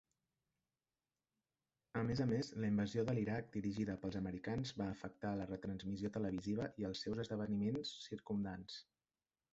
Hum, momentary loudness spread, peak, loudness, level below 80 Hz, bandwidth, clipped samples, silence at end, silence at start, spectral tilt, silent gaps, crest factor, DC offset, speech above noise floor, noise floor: none; 7 LU; -26 dBFS; -42 LUFS; -66 dBFS; 8 kHz; under 0.1%; 0.7 s; 1.95 s; -6.5 dB/octave; none; 18 dB; under 0.1%; over 48 dB; under -90 dBFS